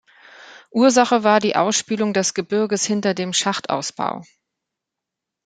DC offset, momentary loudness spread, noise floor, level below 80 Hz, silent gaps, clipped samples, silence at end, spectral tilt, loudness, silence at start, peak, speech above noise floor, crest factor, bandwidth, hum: under 0.1%; 10 LU; -84 dBFS; -68 dBFS; none; under 0.1%; 1.2 s; -3.5 dB/octave; -19 LUFS; 0.4 s; -2 dBFS; 65 dB; 18 dB; 9.6 kHz; none